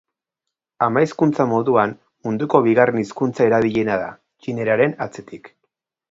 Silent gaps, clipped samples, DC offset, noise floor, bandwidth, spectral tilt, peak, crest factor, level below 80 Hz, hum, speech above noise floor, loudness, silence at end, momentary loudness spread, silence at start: none; under 0.1%; under 0.1%; -83 dBFS; 7.8 kHz; -7.5 dB/octave; 0 dBFS; 20 dB; -60 dBFS; none; 65 dB; -19 LUFS; 0.65 s; 14 LU; 0.8 s